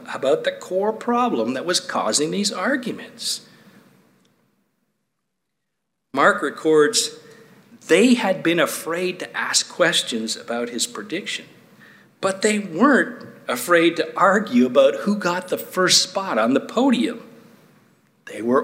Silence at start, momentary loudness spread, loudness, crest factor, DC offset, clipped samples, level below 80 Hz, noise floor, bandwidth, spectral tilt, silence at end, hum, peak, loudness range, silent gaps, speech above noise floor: 0 s; 11 LU; -20 LUFS; 20 dB; under 0.1%; under 0.1%; -76 dBFS; -79 dBFS; 16 kHz; -3 dB/octave; 0 s; none; -2 dBFS; 7 LU; none; 59 dB